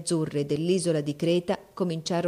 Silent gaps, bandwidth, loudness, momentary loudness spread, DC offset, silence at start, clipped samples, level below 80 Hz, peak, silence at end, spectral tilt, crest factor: none; 14.5 kHz; -27 LUFS; 5 LU; under 0.1%; 0 s; under 0.1%; -64 dBFS; -14 dBFS; 0 s; -5.5 dB/octave; 14 dB